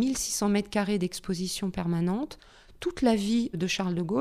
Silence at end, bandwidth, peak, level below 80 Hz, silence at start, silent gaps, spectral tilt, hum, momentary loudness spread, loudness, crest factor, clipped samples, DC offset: 0 s; 15.5 kHz; -10 dBFS; -52 dBFS; 0 s; none; -5 dB/octave; none; 8 LU; -28 LUFS; 18 dB; under 0.1%; under 0.1%